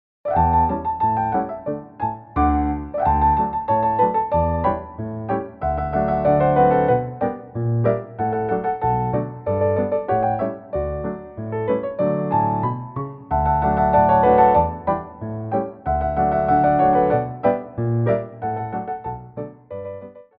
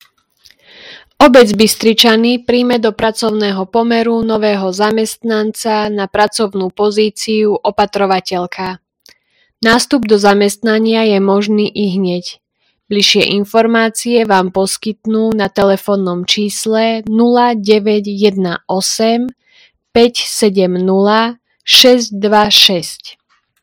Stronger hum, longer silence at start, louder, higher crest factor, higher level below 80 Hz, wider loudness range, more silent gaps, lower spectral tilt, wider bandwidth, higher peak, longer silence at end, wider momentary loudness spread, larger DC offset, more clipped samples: neither; second, 0.25 s vs 0.85 s; second, -20 LUFS vs -12 LUFS; about the same, 16 dB vs 12 dB; first, -36 dBFS vs -48 dBFS; about the same, 5 LU vs 4 LU; neither; first, -12.5 dB/octave vs -4 dB/octave; second, 4.8 kHz vs over 20 kHz; second, -4 dBFS vs 0 dBFS; second, 0.15 s vs 0.5 s; first, 13 LU vs 9 LU; neither; second, under 0.1% vs 0.7%